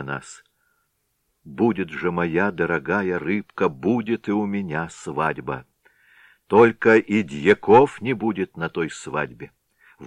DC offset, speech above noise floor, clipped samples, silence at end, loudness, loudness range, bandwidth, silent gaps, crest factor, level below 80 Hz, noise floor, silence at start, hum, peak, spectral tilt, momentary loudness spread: under 0.1%; 51 dB; under 0.1%; 0 s; -21 LUFS; 6 LU; 10 kHz; none; 20 dB; -58 dBFS; -72 dBFS; 0 s; none; -2 dBFS; -6.5 dB/octave; 15 LU